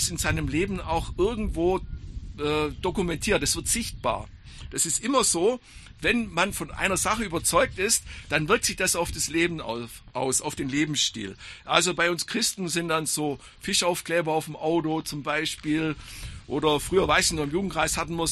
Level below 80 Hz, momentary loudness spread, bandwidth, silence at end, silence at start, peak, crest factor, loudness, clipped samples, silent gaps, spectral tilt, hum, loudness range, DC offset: -42 dBFS; 11 LU; 14 kHz; 0 s; 0 s; -2 dBFS; 24 dB; -25 LUFS; under 0.1%; none; -3 dB/octave; none; 3 LU; under 0.1%